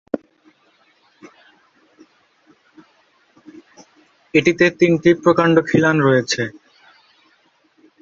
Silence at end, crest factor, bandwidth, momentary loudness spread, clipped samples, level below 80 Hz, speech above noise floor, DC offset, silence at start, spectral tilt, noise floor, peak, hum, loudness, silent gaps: 1.5 s; 18 dB; 7.6 kHz; 10 LU; under 0.1%; -58 dBFS; 44 dB; under 0.1%; 0.15 s; -5.5 dB/octave; -59 dBFS; -2 dBFS; none; -16 LUFS; none